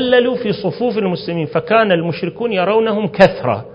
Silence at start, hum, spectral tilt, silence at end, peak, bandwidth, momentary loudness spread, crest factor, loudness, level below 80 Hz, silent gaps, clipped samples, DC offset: 0 s; none; -7.5 dB/octave; 0 s; 0 dBFS; 8 kHz; 8 LU; 16 dB; -16 LUFS; -52 dBFS; none; 0.1%; under 0.1%